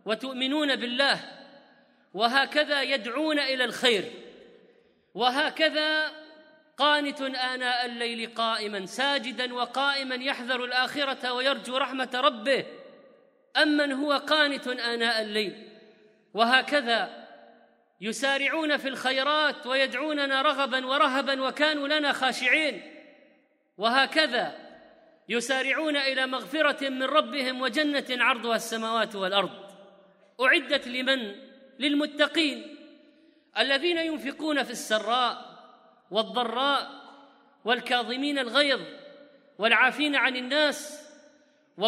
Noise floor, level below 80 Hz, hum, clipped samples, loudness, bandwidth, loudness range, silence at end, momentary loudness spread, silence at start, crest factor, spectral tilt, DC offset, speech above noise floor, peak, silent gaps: -65 dBFS; -84 dBFS; none; under 0.1%; -26 LUFS; 15.5 kHz; 3 LU; 0 s; 9 LU; 0.05 s; 22 dB; -2.5 dB/octave; under 0.1%; 38 dB; -6 dBFS; none